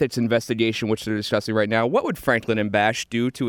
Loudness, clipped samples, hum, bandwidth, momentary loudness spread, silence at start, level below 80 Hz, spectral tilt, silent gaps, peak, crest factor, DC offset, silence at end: -22 LUFS; under 0.1%; none; 19.5 kHz; 4 LU; 0 s; -56 dBFS; -5 dB/octave; none; -6 dBFS; 16 dB; under 0.1%; 0 s